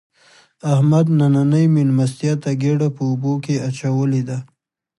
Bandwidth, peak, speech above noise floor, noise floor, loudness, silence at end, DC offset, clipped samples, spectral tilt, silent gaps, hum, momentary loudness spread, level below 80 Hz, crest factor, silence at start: 11.5 kHz; -4 dBFS; 36 dB; -52 dBFS; -18 LUFS; 0.55 s; under 0.1%; under 0.1%; -8 dB/octave; none; none; 8 LU; -62 dBFS; 14 dB; 0.65 s